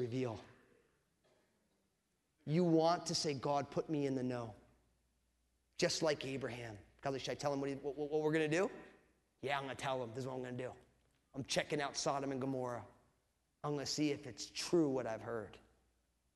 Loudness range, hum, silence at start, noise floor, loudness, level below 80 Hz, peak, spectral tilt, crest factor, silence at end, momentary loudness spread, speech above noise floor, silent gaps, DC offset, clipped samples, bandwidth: 4 LU; none; 0 s; -83 dBFS; -39 LUFS; -72 dBFS; -20 dBFS; -4.5 dB/octave; 20 dB; 0.75 s; 13 LU; 44 dB; none; under 0.1%; under 0.1%; 12 kHz